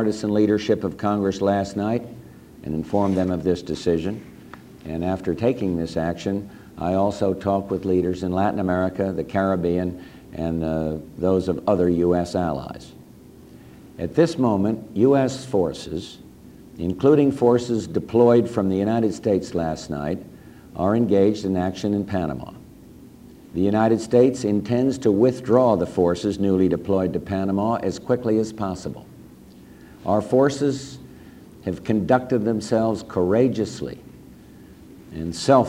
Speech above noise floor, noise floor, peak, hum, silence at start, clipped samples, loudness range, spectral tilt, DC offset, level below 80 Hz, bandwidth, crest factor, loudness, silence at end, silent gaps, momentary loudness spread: 24 dB; -45 dBFS; -2 dBFS; none; 0 s; under 0.1%; 5 LU; -7 dB/octave; under 0.1%; -50 dBFS; 16 kHz; 20 dB; -22 LUFS; 0 s; none; 14 LU